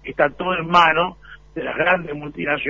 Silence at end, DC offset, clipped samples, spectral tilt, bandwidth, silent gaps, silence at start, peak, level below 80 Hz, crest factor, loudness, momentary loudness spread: 0 s; under 0.1%; under 0.1%; -5.5 dB/octave; 7.6 kHz; none; 0.05 s; -2 dBFS; -48 dBFS; 18 dB; -19 LUFS; 15 LU